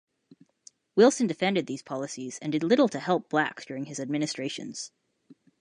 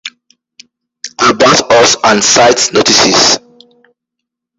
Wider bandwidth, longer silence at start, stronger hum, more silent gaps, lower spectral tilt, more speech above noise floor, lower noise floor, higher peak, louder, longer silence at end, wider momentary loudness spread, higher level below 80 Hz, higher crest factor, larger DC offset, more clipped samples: second, 11 kHz vs 16 kHz; first, 0.95 s vs 0.05 s; neither; neither; first, -4.5 dB/octave vs -1.5 dB/octave; second, 32 dB vs 69 dB; second, -59 dBFS vs -77 dBFS; second, -8 dBFS vs 0 dBFS; second, -27 LUFS vs -7 LUFS; second, 0.25 s vs 1.2 s; about the same, 14 LU vs 12 LU; second, -78 dBFS vs -46 dBFS; first, 20 dB vs 10 dB; neither; second, under 0.1% vs 0.1%